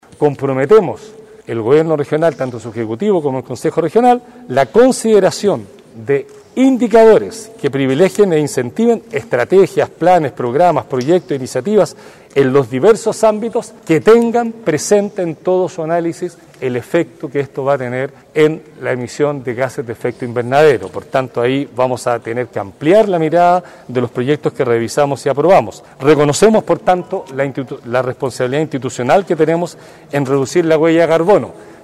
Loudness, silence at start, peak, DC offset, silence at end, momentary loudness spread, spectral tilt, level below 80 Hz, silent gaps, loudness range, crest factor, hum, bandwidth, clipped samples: -14 LUFS; 0.2 s; -2 dBFS; under 0.1%; 0.2 s; 10 LU; -6 dB/octave; -52 dBFS; none; 4 LU; 12 dB; none; 14 kHz; under 0.1%